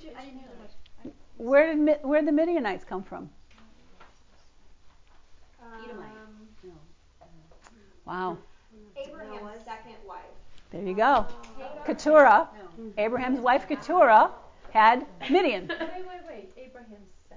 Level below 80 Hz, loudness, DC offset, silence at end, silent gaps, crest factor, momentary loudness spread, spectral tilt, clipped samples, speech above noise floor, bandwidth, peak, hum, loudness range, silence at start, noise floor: -56 dBFS; -23 LUFS; under 0.1%; 0.4 s; none; 20 dB; 26 LU; -5.5 dB/octave; under 0.1%; 30 dB; 7.6 kHz; -6 dBFS; none; 19 LU; 0 s; -55 dBFS